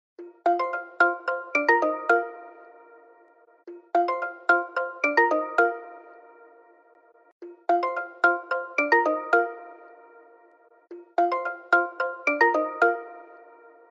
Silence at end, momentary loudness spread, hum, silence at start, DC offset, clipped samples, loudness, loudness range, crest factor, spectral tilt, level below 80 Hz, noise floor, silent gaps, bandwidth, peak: 0.55 s; 12 LU; none; 0.2 s; under 0.1%; under 0.1%; -24 LUFS; 2 LU; 20 dB; -3 dB/octave; under -90 dBFS; -58 dBFS; 7.32-7.40 s; 7.6 kHz; -6 dBFS